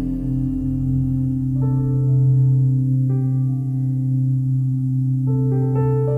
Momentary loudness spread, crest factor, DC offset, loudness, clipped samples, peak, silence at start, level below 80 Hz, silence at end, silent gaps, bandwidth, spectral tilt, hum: 6 LU; 8 dB; under 0.1%; -19 LUFS; under 0.1%; -10 dBFS; 0 s; -36 dBFS; 0 s; none; 1.9 kHz; -12.5 dB/octave; none